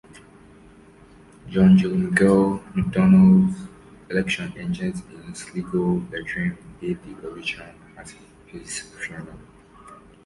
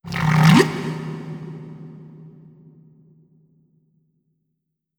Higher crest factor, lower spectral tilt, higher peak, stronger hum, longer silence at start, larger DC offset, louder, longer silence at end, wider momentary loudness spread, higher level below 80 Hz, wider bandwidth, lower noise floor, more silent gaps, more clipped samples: about the same, 18 dB vs 22 dB; about the same, -7 dB/octave vs -6 dB/octave; second, -4 dBFS vs 0 dBFS; neither; first, 1.45 s vs 0.05 s; neither; second, -21 LUFS vs -18 LUFS; second, 0.3 s vs 2.7 s; about the same, 24 LU vs 26 LU; about the same, -48 dBFS vs -52 dBFS; second, 11.5 kHz vs 18 kHz; second, -49 dBFS vs -77 dBFS; neither; neither